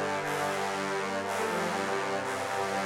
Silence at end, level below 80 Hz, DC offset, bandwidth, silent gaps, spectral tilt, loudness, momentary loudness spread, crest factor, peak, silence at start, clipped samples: 0 s; -74 dBFS; under 0.1%; 16.5 kHz; none; -3.5 dB/octave; -31 LUFS; 2 LU; 12 dB; -18 dBFS; 0 s; under 0.1%